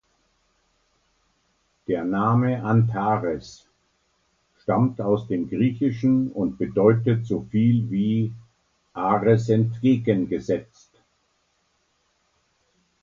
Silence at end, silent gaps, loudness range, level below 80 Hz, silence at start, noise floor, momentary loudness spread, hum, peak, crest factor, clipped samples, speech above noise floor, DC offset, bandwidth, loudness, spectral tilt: 2.4 s; none; 3 LU; -56 dBFS; 1.9 s; -69 dBFS; 9 LU; none; -2 dBFS; 20 dB; under 0.1%; 47 dB; under 0.1%; 7.4 kHz; -23 LUFS; -9 dB/octave